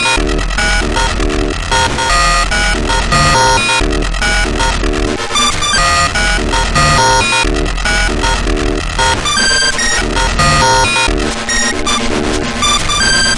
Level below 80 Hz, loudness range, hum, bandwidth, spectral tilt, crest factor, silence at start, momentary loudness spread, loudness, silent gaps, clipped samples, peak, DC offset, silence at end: -18 dBFS; 1 LU; none; 11.5 kHz; -2.5 dB/octave; 12 dB; 0 s; 6 LU; -11 LUFS; none; under 0.1%; 0 dBFS; under 0.1%; 0 s